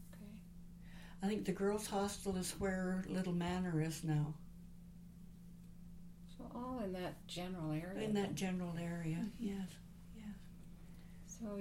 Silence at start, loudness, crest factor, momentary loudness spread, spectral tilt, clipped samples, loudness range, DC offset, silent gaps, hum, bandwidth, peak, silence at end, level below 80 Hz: 0 s; -42 LUFS; 16 dB; 19 LU; -6 dB/octave; under 0.1%; 7 LU; under 0.1%; none; none; 16.5 kHz; -26 dBFS; 0 s; -58 dBFS